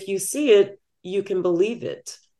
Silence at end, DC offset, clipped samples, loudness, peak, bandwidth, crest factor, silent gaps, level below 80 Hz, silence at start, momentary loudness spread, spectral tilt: 0.25 s; under 0.1%; under 0.1%; -22 LUFS; -6 dBFS; 12.5 kHz; 16 dB; none; -72 dBFS; 0 s; 16 LU; -4 dB/octave